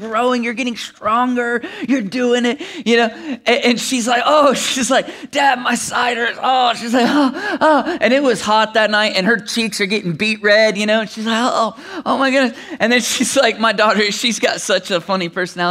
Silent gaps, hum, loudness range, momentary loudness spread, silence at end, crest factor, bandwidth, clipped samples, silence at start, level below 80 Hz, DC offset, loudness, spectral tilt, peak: none; none; 2 LU; 7 LU; 0 s; 16 dB; 16 kHz; under 0.1%; 0 s; -62 dBFS; under 0.1%; -15 LUFS; -3 dB/octave; 0 dBFS